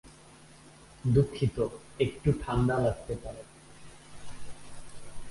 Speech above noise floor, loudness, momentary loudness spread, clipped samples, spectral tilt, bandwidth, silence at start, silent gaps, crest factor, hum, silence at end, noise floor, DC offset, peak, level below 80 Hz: 25 dB; -30 LUFS; 24 LU; under 0.1%; -7.5 dB/octave; 11.5 kHz; 0.05 s; none; 20 dB; none; 0 s; -54 dBFS; under 0.1%; -12 dBFS; -46 dBFS